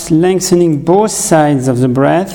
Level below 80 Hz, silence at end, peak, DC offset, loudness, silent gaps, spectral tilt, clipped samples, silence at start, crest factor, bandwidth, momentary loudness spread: -42 dBFS; 0 s; 0 dBFS; under 0.1%; -11 LUFS; none; -5.5 dB/octave; 0.2%; 0 s; 10 dB; 18.5 kHz; 2 LU